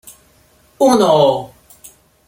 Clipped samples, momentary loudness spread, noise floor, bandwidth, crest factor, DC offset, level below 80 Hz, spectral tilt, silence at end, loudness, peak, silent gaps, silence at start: under 0.1%; 14 LU; -52 dBFS; 17 kHz; 16 dB; under 0.1%; -56 dBFS; -5 dB/octave; 0.8 s; -13 LUFS; 0 dBFS; none; 0.8 s